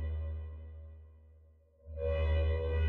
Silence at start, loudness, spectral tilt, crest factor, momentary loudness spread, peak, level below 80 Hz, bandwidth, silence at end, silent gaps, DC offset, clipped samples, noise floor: 0 s; -35 LUFS; -9.5 dB/octave; 14 dB; 20 LU; -22 dBFS; -38 dBFS; 4.2 kHz; 0 s; none; under 0.1%; under 0.1%; -62 dBFS